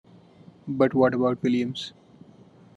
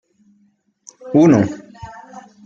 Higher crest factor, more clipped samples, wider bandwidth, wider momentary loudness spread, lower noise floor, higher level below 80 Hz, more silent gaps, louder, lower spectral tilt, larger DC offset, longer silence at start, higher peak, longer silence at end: about the same, 20 dB vs 18 dB; neither; about the same, 8.2 kHz vs 7.6 kHz; second, 16 LU vs 26 LU; second, -52 dBFS vs -60 dBFS; second, -70 dBFS vs -54 dBFS; neither; second, -24 LUFS vs -14 LUFS; about the same, -7 dB/octave vs -8 dB/octave; neither; second, 0.65 s vs 1.05 s; second, -6 dBFS vs -2 dBFS; first, 0.85 s vs 0.25 s